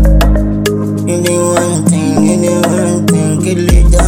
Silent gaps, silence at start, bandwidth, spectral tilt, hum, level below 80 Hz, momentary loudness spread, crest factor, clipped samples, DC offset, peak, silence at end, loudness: none; 0 s; 16 kHz; -5.5 dB/octave; none; -14 dBFS; 4 LU; 10 dB; under 0.1%; under 0.1%; 0 dBFS; 0 s; -11 LUFS